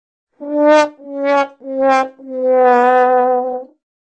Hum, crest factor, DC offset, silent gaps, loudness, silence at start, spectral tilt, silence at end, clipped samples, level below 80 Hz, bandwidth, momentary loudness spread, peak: none; 14 dB; under 0.1%; none; -14 LUFS; 0.4 s; -3 dB/octave; 0.45 s; under 0.1%; -68 dBFS; 8.6 kHz; 12 LU; 0 dBFS